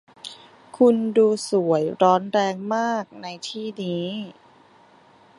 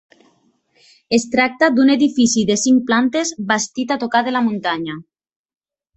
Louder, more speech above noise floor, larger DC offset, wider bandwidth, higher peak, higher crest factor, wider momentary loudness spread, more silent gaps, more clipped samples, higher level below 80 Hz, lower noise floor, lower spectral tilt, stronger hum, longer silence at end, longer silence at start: second, -22 LUFS vs -16 LUFS; second, 32 dB vs 44 dB; neither; first, 11.5 kHz vs 8.4 kHz; about the same, -4 dBFS vs -2 dBFS; about the same, 20 dB vs 16 dB; first, 17 LU vs 8 LU; neither; neither; second, -74 dBFS vs -58 dBFS; second, -53 dBFS vs -60 dBFS; first, -5.5 dB/octave vs -3.5 dB/octave; neither; about the same, 1.05 s vs 0.95 s; second, 0.25 s vs 1.1 s